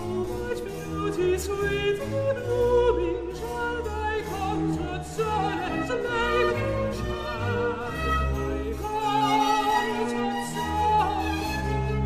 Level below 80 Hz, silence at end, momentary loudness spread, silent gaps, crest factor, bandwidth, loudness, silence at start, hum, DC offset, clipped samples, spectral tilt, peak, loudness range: -38 dBFS; 0 s; 8 LU; none; 16 dB; 15.5 kHz; -26 LUFS; 0 s; none; under 0.1%; under 0.1%; -5.5 dB/octave; -10 dBFS; 2 LU